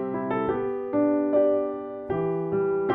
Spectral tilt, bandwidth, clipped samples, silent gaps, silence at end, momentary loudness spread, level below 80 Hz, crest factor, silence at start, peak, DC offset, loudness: -11 dB/octave; 3.8 kHz; under 0.1%; none; 0 s; 8 LU; -58 dBFS; 14 dB; 0 s; -10 dBFS; under 0.1%; -26 LUFS